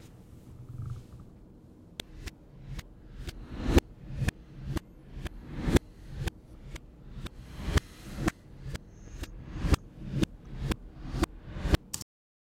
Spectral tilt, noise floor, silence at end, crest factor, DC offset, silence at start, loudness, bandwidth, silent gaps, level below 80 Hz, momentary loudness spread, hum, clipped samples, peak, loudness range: -5.5 dB/octave; -53 dBFS; 0.45 s; 28 dB; under 0.1%; 0 s; -35 LUFS; 16.5 kHz; none; -38 dBFS; 21 LU; none; under 0.1%; -6 dBFS; 5 LU